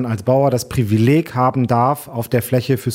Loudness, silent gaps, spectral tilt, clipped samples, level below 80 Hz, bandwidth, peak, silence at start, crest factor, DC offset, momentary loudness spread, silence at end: -17 LUFS; none; -7 dB/octave; under 0.1%; -48 dBFS; 16 kHz; -2 dBFS; 0 s; 14 dB; under 0.1%; 5 LU; 0 s